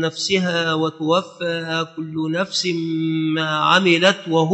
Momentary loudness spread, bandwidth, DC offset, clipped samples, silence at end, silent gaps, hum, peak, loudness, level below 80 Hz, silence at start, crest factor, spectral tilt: 9 LU; 8.6 kHz; under 0.1%; under 0.1%; 0 s; none; none; 0 dBFS; -19 LUFS; -66 dBFS; 0 s; 20 dB; -4.5 dB/octave